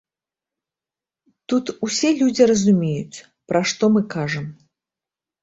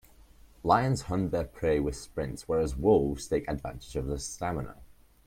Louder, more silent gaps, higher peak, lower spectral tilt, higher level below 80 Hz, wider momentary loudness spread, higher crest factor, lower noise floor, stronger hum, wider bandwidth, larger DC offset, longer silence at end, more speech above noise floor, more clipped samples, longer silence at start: first, -19 LUFS vs -30 LUFS; neither; first, -2 dBFS vs -8 dBFS; about the same, -5 dB/octave vs -6 dB/octave; second, -60 dBFS vs -44 dBFS; about the same, 13 LU vs 12 LU; about the same, 20 dB vs 22 dB; first, -90 dBFS vs -55 dBFS; neither; second, 8 kHz vs 16.5 kHz; neither; first, 0.9 s vs 0.4 s; first, 71 dB vs 26 dB; neither; first, 1.5 s vs 0.65 s